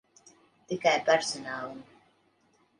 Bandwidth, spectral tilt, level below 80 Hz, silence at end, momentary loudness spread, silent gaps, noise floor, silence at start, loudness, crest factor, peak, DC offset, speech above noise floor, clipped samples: 11 kHz; -2.5 dB/octave; -76 dBFS; 0.95 s; 16 LU; none; -68 dBFS; 0.7 s; -28 LUFS; 22 dB; -10 dBFS; under 0.1%; 40 dB; under 0.1%